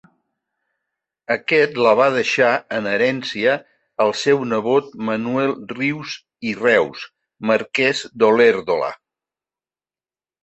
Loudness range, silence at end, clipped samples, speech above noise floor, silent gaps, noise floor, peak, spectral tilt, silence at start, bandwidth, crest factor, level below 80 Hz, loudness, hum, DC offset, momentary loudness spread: 3 LU; 1.45 s; under 0.1%; over 72 dB; none; under -90 dBFS; -2 dBFS; -4.5 dB/octave; 1.3 s; 8.4 kHz; 18 dB; -64 dBFS; -18 LUFS; none; under 0.1%; 12 LU